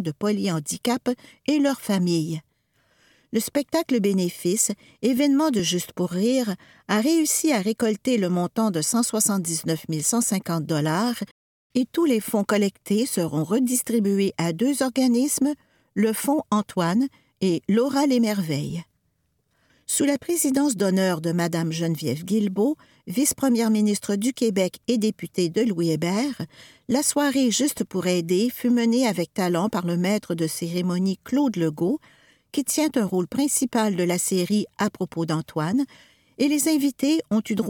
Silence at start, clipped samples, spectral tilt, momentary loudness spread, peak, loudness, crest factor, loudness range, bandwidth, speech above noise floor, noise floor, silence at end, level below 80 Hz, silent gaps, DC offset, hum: 0 s; under 0.1%; -4.5 dB/octave; 6 LU; -8 dBFS; -23 LUFS; 16 dB; 2 LU; 19 kHz; 48 dB; -71 dBFS; 0 s; -66 dBFS; 11.31-11.70 s; under 0.1%; none